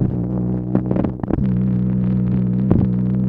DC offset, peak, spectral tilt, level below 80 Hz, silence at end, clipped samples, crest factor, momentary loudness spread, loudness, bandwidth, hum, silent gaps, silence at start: under 0.1%; 0 dBFS; -13 dB/octave; -32 dBFS; 0 s; under 0.1%; 18 dB; 4 LU; -19 LUFS; 3.2 kHz; none; none; 0 s